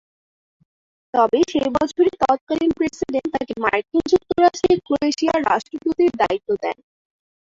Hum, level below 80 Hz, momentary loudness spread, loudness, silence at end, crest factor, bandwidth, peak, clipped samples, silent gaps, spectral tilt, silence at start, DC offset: none; -52 dBFS; 7 LU; -20 LUFS; 0.8 s; 18 dB; 7.8 kHz; -2 dBFS; under 0.1%; 2.41-2.47 s; -5 dB/octave; 1.15 s; under 0.1%